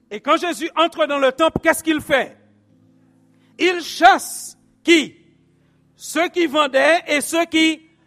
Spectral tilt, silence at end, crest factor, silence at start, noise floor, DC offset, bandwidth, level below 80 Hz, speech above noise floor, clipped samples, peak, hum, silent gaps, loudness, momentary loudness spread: -2.5 dB/octave; 0.3 s; 20 dB; 0.1 s; -58 dBFS; under 0.1%; 15.5 kHz; -54 dBFS; 40 dB; under 0.1%; 0 dBFS; none; none; -17 LUFS; 12 LU